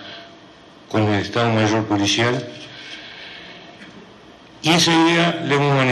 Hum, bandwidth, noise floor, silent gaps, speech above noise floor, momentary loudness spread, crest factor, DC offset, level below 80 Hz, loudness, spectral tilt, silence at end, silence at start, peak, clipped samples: none; 12.5 kHz; -45 dBFS; none; 27 dB; 22 LU; 16 dB; under 0.1%; -58 dBFS; -18 LUFS; -4.5 dB/octave; 0 s; 0 s; -4 dBFS; under 0.1%